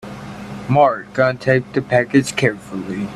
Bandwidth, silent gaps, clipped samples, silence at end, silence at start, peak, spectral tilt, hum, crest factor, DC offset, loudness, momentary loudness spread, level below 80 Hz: 13 kHz; none; under 0.1%; 0 s; 0.05 s; -2 dBFS; -6 dB/octave; none; 16 dB; under 0.1%; -17 LUFS; 16 LU; -50 dBFS